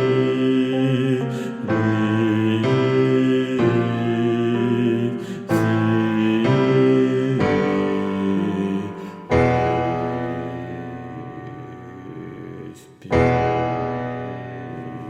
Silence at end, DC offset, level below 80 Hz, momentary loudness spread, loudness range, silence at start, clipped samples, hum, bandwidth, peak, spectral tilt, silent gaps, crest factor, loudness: 0 s; under 0.1%; -48 dBFS; 17 LU; 6 LU; 0 s; under 0.1%; none; 14 kHz; -6 dBFS; -8 dB/octave; none; 16 dB; -20 LUFS